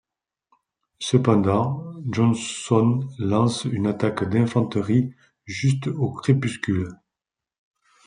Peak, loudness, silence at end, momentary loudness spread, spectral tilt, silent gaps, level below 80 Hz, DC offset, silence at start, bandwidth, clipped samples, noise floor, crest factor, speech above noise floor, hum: -4 dBFS; -23 LUFS; 1.1 s; 8 LU; -6.5 dB/octave; none; -62 dBFS; under 0.1%; 1 s; 10.5 kHz; under 0.1%; -88 dBFS; 18 dB; 66 dB; none